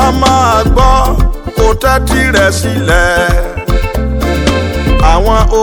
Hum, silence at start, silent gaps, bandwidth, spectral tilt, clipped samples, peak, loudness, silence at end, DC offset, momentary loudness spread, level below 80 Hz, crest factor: none; 0 s; none; 19 kHz; -5 dB/octave; 0.8%; 0 dBFS; -10 LUFS; 0 s; under 0.1%; 6 LU; -14 dBFS; 8 dB